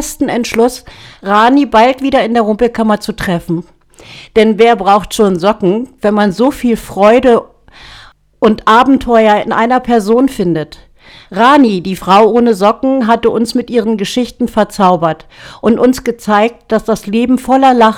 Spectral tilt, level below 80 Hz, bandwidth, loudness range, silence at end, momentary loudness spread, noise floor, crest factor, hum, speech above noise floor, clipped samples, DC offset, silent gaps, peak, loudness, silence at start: -5.5 dB/octave; -38 dBFS; 16 kHz; 2 LU; 0 s; 8 LU; -38 dBFS; 10 dB; none; 28 dB; under 0.1%; under 0.1%; none; 0 dBFS; -11 LUFS; 0 s